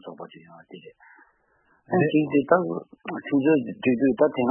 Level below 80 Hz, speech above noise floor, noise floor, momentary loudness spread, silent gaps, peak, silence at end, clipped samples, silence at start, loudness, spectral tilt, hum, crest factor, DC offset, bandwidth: -66 dBFS; 42 dB; -65 dBFS; 16 LU; none; -4 dBFS; 0 s; under 0.1%; 0.05 s; -23 LUFS; -11.5 dB/octave; none; 20 dB; under 0.1%; 3.3 kHz